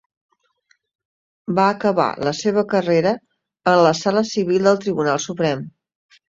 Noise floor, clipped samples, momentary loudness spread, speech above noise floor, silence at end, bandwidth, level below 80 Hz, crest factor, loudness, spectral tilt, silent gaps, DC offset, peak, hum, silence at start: -64 dBFS; under 0.1%; 8 LU; 46 dB; 0.6 s; 7.8 kHz; -60 dBFS; 18 dB; -19 LUFS; -5.5 dB/octave; none; under 0.1%; -2 dBFS; none; 1.5 s